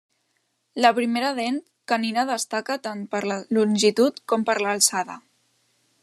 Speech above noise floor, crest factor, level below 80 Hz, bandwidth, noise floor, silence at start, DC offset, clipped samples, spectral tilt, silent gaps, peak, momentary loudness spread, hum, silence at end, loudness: 49 dB; 22 dB; -78 dBFS; 13.5 kHz; -72 dBFS; 0.75 s; under 0.1%; under 0.1%; -3 dB/octave; none; -2 dBFS; 10 LU; none; 0.85 s; -23 LUFS